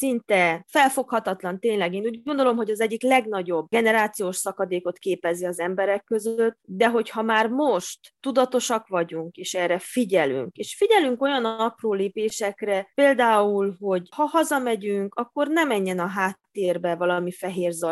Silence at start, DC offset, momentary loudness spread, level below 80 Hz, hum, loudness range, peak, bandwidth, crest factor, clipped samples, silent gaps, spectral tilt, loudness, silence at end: 0 s; under 0.1%; 7 LU; -74 dBFS; none; 2 LU; -4 dBFS; 13.5 kHz; 18 dB; under 0.1%; none; -4 dB/octave; -23 LUFS; 0 s